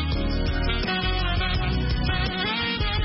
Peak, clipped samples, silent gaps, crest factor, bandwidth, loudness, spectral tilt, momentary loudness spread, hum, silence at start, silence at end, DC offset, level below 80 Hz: -12 dBFS; under 0.1%; none; 12 dB; 5.8 kHz; -25 LUFS; -9 dB/octave; 2 LU; none; 0 s; 0 s; under 0.1%; -28 dBFS